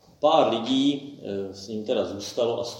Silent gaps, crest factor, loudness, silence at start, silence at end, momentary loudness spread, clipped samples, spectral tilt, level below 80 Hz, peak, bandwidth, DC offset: none; 20 dB; -25 LUFS; 0.2 s; 0 s; 13 LU; under 0.1%; -5 dB/octave; -70 dBFS; -6 dBFS; 16.5 kHz; under 0.1%